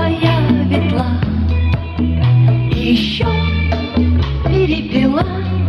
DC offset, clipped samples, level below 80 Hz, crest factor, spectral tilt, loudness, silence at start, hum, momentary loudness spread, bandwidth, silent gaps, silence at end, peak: under 0.1%; under 0.1%; -24 dBFS; 12 dB; -8.5 dB/octave; -15 LUFS; 0 s; none; 4 LU; 6.4 kHz; none; 0 s; -2 dBFS